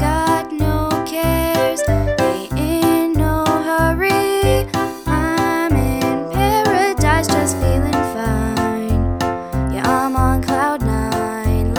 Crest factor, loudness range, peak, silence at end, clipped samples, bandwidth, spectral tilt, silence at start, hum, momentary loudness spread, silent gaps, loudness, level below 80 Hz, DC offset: 16 dB; 2 LU; 0 dBFS; 0 s; under 0.1%; over 20 kHz; -5.5 dB/octave; 0 s; none; 5 LU; none; -17 LUFS; -26 dBFS; under 0.1%